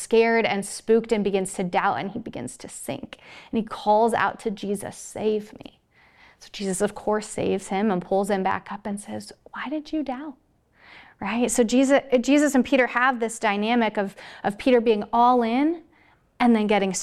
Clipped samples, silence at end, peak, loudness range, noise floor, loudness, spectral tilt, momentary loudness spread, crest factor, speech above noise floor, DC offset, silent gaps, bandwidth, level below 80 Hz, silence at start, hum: under 0.1%; 0 s; -6 dBFS; 7 LU; -59 dBFS; -23 LUFS; -4.5 dB/octave; 16 LU; 16 dB; 36 dB; under 0.1%; none; 14.5 kHz; -56 dBFS; 0 s; none